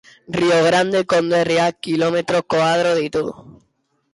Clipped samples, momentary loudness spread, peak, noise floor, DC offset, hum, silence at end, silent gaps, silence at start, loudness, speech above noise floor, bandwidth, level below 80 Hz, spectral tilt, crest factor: under 0.1%; 7 LU; -6 dBFS; -66 dBFS; under 0.1%; none; 0.6 s; none; 0.3 s; -17 LUFS; 49 dB; 11.5 kHz; -56 dBFS; -5 dB/octave; 12 dB